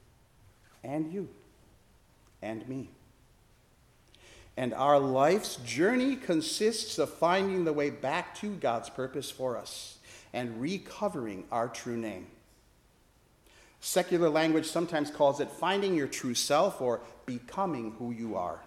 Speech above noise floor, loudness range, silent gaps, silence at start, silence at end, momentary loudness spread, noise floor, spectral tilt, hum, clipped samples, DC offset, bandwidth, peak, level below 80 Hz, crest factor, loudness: 34 dB; 13 LU; none; 0.85 s; 0 s; 14 LU; -64 dBFS; -4.5 dB/octave; none; under 0.1%; under 0.1%; 16 kHz; -10 dBFS; -66 dBFS; 22 dB; -31 LUFS